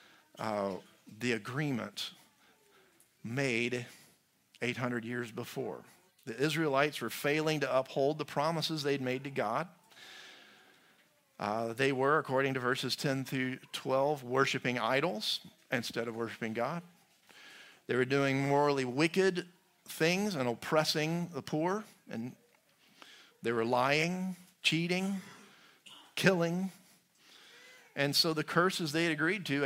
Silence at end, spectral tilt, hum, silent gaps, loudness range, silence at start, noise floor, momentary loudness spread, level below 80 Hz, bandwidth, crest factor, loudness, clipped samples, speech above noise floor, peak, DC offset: 0 s; -4.5 dB/octave; none; none; 6 LU; 0.35 s; -68 dBFS; 14 LU; -78 dBFS; 16 kHz; 26 dB; -33 LUFS; under 0.1%; 35 dB; -8 dBFS; under 0.1%